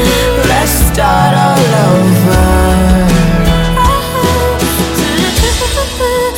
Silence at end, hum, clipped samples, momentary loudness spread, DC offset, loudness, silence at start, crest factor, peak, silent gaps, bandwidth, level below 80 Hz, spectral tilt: 0 s; none; under 0.1%; 4 LU; under 0.1%; -10 LUFS; 0 s; 10 dB; 0 dBFS; none; 17 kHz; -16 dBFS; -5 dB/octave